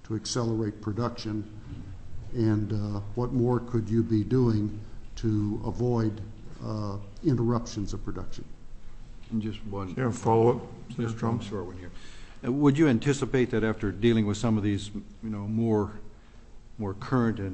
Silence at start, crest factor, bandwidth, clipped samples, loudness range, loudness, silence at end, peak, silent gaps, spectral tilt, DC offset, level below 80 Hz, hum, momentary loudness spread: 0 s; 18 dB; 8.6 kHz; under 0.1%; 5 LU; -28 LUFS; 0 s; -10 dBFS; none; -7 dB/octave; under 0.1%; -44 dBFS; none; 17 LU